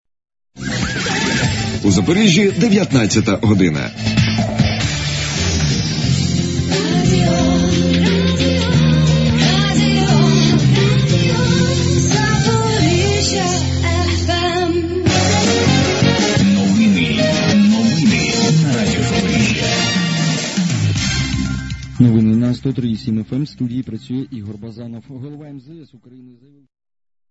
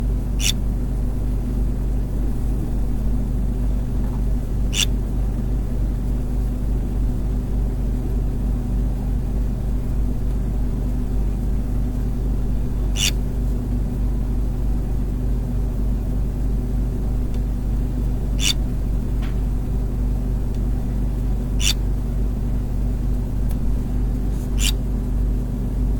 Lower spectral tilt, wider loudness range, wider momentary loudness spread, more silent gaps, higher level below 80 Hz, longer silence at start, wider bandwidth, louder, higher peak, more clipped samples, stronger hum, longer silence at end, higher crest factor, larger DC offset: about the same, -5 dB/octave vs -5 dB/octave; first, 5 LU vs 1 LU; first, 10 LU vs 4 LU; neither; second, -32 dBFS vs -22 dBFS; first, 0.55 s vs 0 s; second, 8 kHz vs 18 kHz; first, -15 LUFS vs -24 LUFS; about the same, 0 dBFS vs -2 dBFS; neither; neither; first, 1.45 s vs 0 s; about the same, 14 dB vs 18 dB; second, under 0.1% vs 0.2%